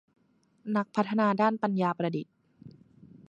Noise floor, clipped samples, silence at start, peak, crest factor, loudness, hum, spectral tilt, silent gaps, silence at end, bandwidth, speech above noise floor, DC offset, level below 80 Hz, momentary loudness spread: -63 dBFS; under 0.1%; 0.65 s; -12 dBFS; 18 dB; -29 LUFS; none; -8 dB/octave; none; 0.6 s; 7.4 kHz; 36 dB; under 0.1%; -76 dBFS; 13 LU